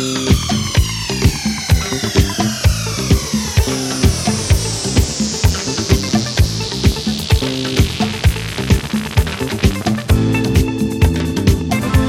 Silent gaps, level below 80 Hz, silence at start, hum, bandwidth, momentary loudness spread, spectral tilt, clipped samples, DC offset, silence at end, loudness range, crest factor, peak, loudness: none; -22 dBFS; 0 s; none; 16.5 kHz; 3 LU; -4.5 dB/octave; under 0.1%; under 0.1%; 0 s; 1 LU; 16 dB; 0 dBFS; -16 LUFS